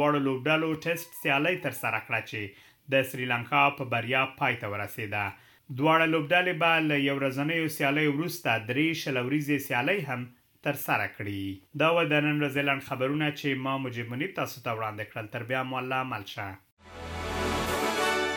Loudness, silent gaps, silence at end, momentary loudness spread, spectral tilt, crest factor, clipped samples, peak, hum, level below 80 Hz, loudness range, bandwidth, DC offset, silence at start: -28 LUFS; 16.72-16.77 s; 0 s; 12 LU; -5 dB/octave; 20 dB; under 0.1%; -8 dBFS; none; -56 dBFS; 6 LU; 17.5 kHz; under 0.1%; 0 s